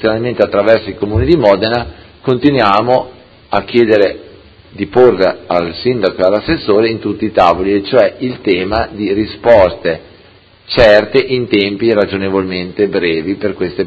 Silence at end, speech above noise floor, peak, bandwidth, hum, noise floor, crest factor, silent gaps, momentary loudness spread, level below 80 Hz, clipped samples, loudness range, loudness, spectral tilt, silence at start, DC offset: 0 s; 32 dB; 0 dBFS; 8 kHz; none; -43 dBFS; 12 dB; none; 9 LU; -34 dBFS; 0.4%; 2 LU; -12 LUFS; -7.5 dB/octave; 0 s; under 0.1%